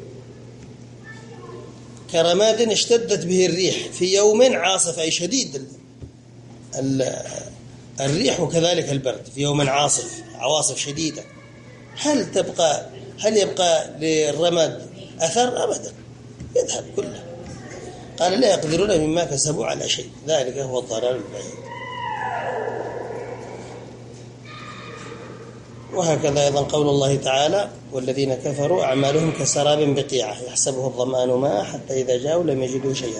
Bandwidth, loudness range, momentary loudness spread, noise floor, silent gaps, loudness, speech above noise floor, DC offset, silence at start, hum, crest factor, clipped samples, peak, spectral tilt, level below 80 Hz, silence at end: 11 kHz; 8 LU; 20 LU; -43 dBFS; none; -21 LUFS; 23 dB; under 0.1%; 0 s; none; 18 dB; under 0.1%; -4 dBFS; -3.5 dB/octave; -54 dBFS; 0 s